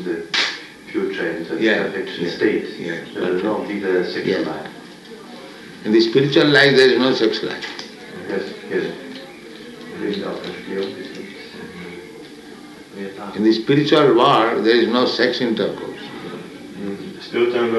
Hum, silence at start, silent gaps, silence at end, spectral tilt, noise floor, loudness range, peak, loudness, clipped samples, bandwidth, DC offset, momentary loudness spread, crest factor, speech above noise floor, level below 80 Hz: none; 0 s; none; 0 s; -5.5 dB/octave; -39 dBFS; 13 LU; -2 dBFS; -18 LUFS; under 0.1%; 12 kHz; under 0.1%; 23 LU; 18 dB; 21 dB; -62 dBFS